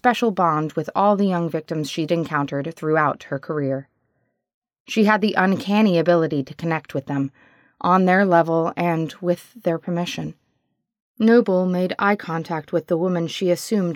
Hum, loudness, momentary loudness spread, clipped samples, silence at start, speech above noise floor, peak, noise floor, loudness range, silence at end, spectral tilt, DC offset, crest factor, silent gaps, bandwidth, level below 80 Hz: none; -21 LUFS; 10 LU; under 0.1%; 0.05 s; 53 dB; -4 dBFS; -73 dBFS; 3 LU; 0 s; -6.5 dB/octave; under 0.1%; 18 dB; 4.54-4.62 s, 4.80-4.85 s, 11.02-11.15 s; 17 kHz; -68 dBFS